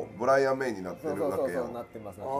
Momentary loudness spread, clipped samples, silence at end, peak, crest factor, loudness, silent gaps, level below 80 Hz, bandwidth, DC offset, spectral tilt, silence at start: 15 LU; under 0.1%; 0 s; -12 dBFS; 16 dB; -29 LUFS; none; -64 dBFS; 15.5 kHz; under 0.1%; -6 dB/octave; 0 s